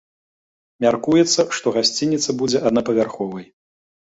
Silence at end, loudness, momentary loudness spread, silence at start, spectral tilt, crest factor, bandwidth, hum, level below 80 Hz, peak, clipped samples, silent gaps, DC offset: 0.7 s; -19 LUFS; 9 LU; 0.8 s; -4 dB/octave; 18 dB; 8 kHz; none; -58 dBFS; -2 dBFS; under 0.1%; none; under 0.1%